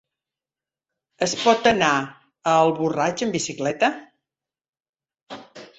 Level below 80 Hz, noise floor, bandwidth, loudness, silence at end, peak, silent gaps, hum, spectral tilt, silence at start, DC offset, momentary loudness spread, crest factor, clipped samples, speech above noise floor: -62 dBFS; under -90 dBFS; 8.4 kHz; -21 LUFS; 0.15 s; -4 dBFS; 4.69-4.73 s, 4.89-4.93 s, 5.23-5.27 s; none; -3.5 dB/octave; 1.2 s; under 0.1%; 21 LU; 20 dB; under 0.1%; over 70 dB